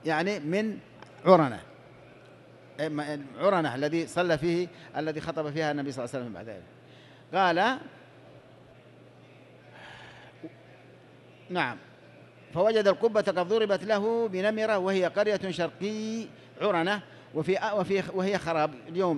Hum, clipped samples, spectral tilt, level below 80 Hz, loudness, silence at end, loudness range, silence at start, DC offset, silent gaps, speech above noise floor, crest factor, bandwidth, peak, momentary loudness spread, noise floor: none; under 0.1%; -6 dB/octave; -66 dBFS; -28 LUFS; 0 s; 7 LU; 0.05 s; under 0.1%; none; 26 dB; 24 dB; 12 kHz; -6 dBFS; 20 LU; -53 dBFS